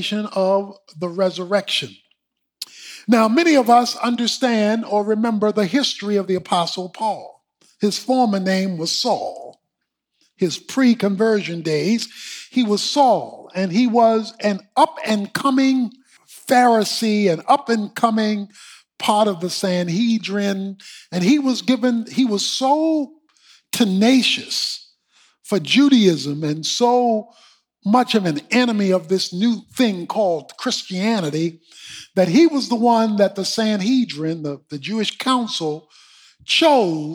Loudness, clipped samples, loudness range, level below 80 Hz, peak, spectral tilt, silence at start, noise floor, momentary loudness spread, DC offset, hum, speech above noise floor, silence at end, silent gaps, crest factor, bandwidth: -18 LUFS; under 0.1%; 3 LU; -74 dBFS; -2 dBFS; -4.5 dB/octave; 0 s; -78 dBFS; 12 LU; under 0.1%; none; 59 dB; 0 s; none; 16 dB; 18.5 kHz